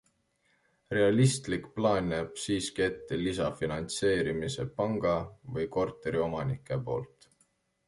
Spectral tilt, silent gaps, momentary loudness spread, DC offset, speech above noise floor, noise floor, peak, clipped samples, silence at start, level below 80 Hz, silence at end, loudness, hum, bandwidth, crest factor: -5.5 dB/octave; none; 8 LU; under 0.1%; 42 dB; -72 dBFS; -12 dBFS; under 0.1%; 0.9 s; -54 dBFS; 0.8 s; -31 LUFS; none; 11.5 kHz; 20 dB